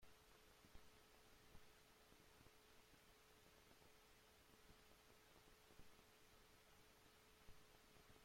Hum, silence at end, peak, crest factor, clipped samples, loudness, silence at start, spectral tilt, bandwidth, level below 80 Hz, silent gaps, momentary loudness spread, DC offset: none; 0 s; -50 dBFS; 18 dB; under 0.1%; -70 LUFS; 0 s; -3 dB/octave; 16.5 kHz; -78 dBFS; none; 0 LU; under 0.1%